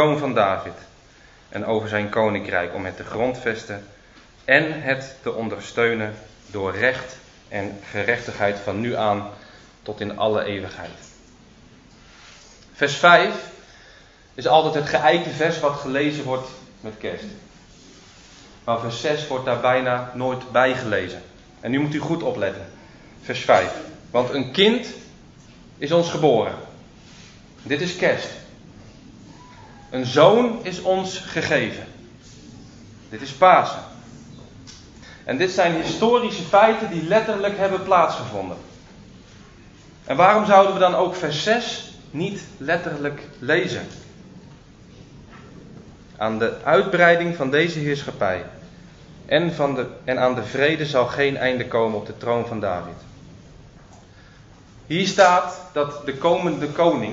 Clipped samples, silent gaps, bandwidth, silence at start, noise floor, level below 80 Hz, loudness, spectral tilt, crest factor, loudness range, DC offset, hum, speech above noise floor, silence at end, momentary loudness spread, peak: under 0.1%; none; 8 kHz; 0 s; -50 dBFS; -54 dBFS; -21 LUFS; -5 dB/octave; 22 dB; 8 LU; under 0.1%; none; 29 dB; 0 s; 19 LU; 0 dBFS